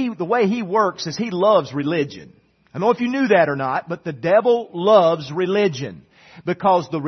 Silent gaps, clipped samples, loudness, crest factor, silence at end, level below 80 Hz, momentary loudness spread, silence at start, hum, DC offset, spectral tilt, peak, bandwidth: none; under 0.1%; -19 LUFS; 18 dB; 0 s; -64 dBFS; 12 LU; 0 s; none; under 0.1%; -6 dB/octave; 0 dBFS; 6.4 kHz